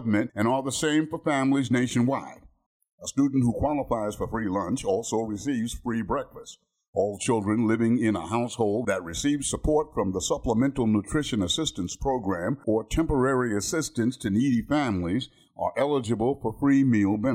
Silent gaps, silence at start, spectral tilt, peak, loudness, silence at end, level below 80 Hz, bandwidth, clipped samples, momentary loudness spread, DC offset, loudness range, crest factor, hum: 2.66-2.80 s, 2.93-2.98 s, 6.88-6.93 s; 0 s; -5.5 dB/octave; -12 dBFS; -26 LUFS; 0 s; -44 dBFS; 15.5 kHz; under 0.1%; 7 LU; under 0.1%; 2 LU; 14 dB; none